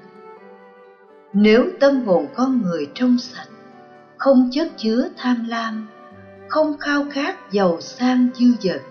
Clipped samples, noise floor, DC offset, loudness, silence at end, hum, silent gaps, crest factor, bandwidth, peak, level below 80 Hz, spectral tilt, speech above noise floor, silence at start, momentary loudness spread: under 0.1%; -47 dBFS; under 0.1%; -19 LUFS; 0 s; none; none; 14 dB; 6.6 kHz; -4 dBFS; -60 dBFS; -6.5 dB/octave; 29 dB; 0.25 s; 10 LU